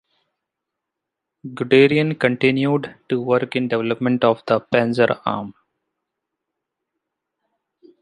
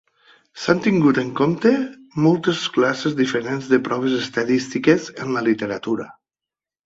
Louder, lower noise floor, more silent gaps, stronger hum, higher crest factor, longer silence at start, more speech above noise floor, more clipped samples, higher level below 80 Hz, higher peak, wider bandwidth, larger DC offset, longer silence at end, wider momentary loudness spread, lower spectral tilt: about the same, -19 LUFS vs -20 LUFS; second, -82 dBFS vs -89 dBFS; neither; neither; about the same, 20 dB vs 18 dB; first, 1.45 s vs 0.55 s; second, 64 dB vs 70 dB; neither; about the same, -62 dBFS vs -60 dBFS; about the same, -2 dBFS vs -2 dBFS; first, 10.5 kHz vs 8 kHz; neither; first, 2.5 s vs 0.75 s; first, 13 LU vs 8 LU; first, -7.5 dB/octave vs -6 dB/octave